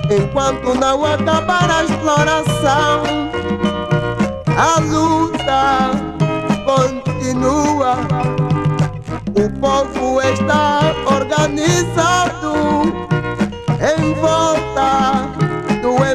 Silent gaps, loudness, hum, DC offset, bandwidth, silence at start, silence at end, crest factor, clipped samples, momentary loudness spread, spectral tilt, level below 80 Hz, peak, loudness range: none; -16 LUFS; none; under 0.1%; 13.5 kHz; 0 s; 0 s; 14 dB; under 0.1%; 5 LU; -5.5 dB/octave; -36 dBFS; 0 dBFS; 2 LU